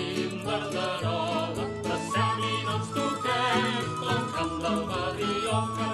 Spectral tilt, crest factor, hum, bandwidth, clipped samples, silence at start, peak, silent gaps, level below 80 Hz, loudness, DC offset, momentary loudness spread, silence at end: -5 dB/octave; 16 dB; none; 12.5 kHz; under 0.1%; 0 s; -14 dBFS; none; -54 dBFS; -28 LUFS; under 0.1%; 5 LU; 0 s